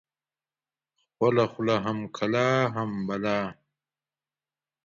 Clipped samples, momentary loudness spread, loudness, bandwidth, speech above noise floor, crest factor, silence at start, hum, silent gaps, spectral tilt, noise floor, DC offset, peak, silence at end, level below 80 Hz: under 0.1%; 7 LU; -26 LUFS; 7.4 kHz; over 64 dB; 20 dB; 1.2 s; none; none; -6.5 dB/octave; under -90 dBFS; under 0.1%; -10 dBFS; 1.3 s; -66 dBFS